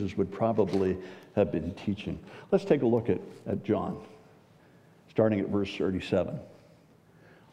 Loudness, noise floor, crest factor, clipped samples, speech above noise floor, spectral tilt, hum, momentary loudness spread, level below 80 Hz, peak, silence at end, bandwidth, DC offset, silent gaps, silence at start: -30 LUFS; -59 dBFS; 20 dB; under 0.1%; 30 dB; -8 dB/octave; none; 11 LU; -58 dBFS; -10 dBFS; 1 s; 10.5 kHz; under 0.1%; none; 0 s